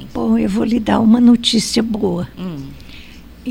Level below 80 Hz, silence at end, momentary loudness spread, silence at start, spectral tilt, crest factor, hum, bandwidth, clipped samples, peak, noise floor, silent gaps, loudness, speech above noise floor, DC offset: -40 dBFS; 0 s; 18 LU; 0 s; -5 dB/octave; 16 dB; none; 15.5 kHz; under 0.1%; 0 dBFS; -37 dBFS; none; -14 LUFS; 22 dB; under 0.1%